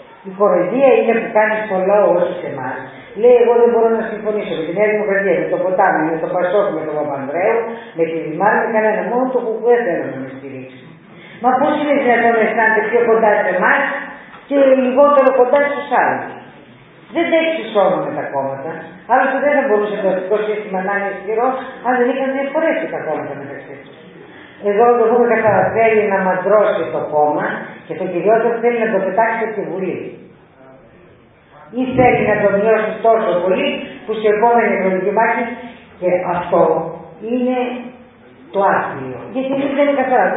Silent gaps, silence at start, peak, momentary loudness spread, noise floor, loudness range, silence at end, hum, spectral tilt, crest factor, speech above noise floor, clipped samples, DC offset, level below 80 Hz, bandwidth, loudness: none; 0.25 s; 0 dBFS; 13 LU; -46 dBFS; 5 LU; 0 s; none; -10 dB/octave; 16 dB; 31 dB; under 0.1%; under 0.1%; -54 dBFS; 4 kHz; -15 LUFS